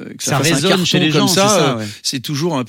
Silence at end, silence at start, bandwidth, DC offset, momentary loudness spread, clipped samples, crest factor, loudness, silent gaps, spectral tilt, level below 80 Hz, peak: 0 s; 0 s; 16.5 kHz; under 0.1%; 8 LU; under 0.1%; 14 dB; -14 LUFS; none; -4 dB/octave; -56 dBFS; 0 dBFS